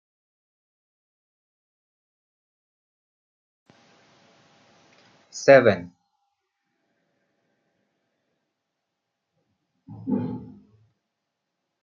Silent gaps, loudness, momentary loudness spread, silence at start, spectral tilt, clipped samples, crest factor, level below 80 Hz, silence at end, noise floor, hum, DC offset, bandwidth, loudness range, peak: none; -20 LUFS; 23 LU; 5.35 s; -5 dB/octave; under 0.1%; 26 dB; -74 dBFS; 1.35 s; -81 dBFS; none; under 0.1%; 7.4 kHz; 13 LU; -2 dBFS